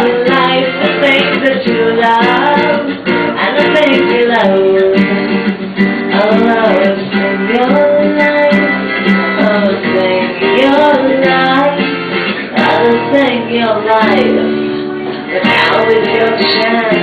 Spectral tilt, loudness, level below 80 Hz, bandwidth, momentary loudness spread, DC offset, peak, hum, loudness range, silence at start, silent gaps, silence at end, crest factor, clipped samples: -7 dB/octave; -10 LUFS; -48 dBFS; 8.8 kHz; 5 LU; under 0.1%; 0 dBFS; none; 1 LU; 0 s; none; 0 s; 10 dB; under 0.1%